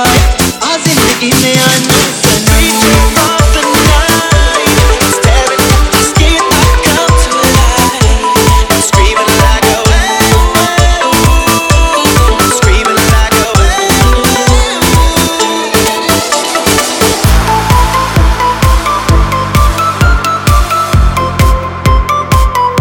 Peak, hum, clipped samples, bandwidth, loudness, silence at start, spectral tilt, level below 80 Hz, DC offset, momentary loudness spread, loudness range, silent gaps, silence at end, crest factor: 0 dBFS; none; 0.8%; 19.5 kHz; -8 LUFS; 0 s; -3.5 dB/octave; -12 dBFS; under 0.1%; 3 LU; 2 LU; none; 0 s; 8 dB